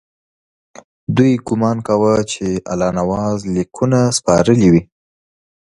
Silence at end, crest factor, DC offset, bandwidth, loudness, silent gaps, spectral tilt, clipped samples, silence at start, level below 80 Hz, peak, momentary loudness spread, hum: 0.8 s; 16 dB; under 0.1%; 11.5 kHz; -15 LUFS; none; -6 dB/octave; under 0.1%; 1.1 s; -44 dBFS; 0 dBFS; 8 LU; none